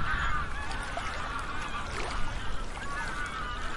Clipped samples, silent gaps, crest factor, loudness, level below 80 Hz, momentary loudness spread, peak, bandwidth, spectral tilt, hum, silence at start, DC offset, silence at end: under 0.1%; none; 14 dB; -35 LUFS; -38 dBFS; 6 LU; -18 dBFS; 11.5 kHz; -3.5 dB/octave; none; 0 s; under 0.1%; 0 s